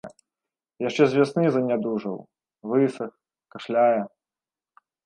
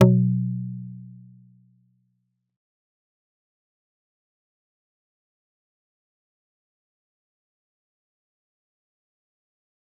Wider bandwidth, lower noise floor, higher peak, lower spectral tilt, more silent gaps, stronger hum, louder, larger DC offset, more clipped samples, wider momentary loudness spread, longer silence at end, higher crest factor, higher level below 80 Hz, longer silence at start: first, 10 kHz vs 3.6 kHz; first, under -90 dBFS vs -74 dBFS; second, -6 dBFS vs -2 dBFS; second, -7 dB/octave vs -10 dB/octave; neither; neither; about the same, -23 LUFS vs -23 LUFS; neither; neither; second, 17 LU vs 23 LU; second, 1 s vs 8.9 s; second, 20 dB vs 28 dB; about the same, -72 dBFS vs -68 dBFS; about the same, 0.05 s vs 0 s